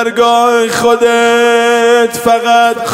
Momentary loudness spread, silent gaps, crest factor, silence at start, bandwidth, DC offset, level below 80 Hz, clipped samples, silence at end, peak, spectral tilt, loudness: 2 LU; none; 8 dB; 0 s; 16.5 kHz; under 0.1%; -50 dBFS; under 0.1%; 0 s; 0 dBFS; -2.5 dB/octave; -9 LUFS